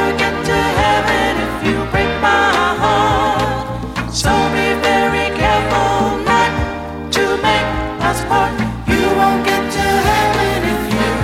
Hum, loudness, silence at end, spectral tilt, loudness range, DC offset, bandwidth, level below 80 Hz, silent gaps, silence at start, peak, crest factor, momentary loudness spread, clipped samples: none; -15 LUFS; 0 s; -4.5 dB/octave; 1 LU; under 0.1%; 16.5 kHz; -30 dBFS; none; 0 s; 0 dBFS; 14 dB; 5 LU; under 0.1%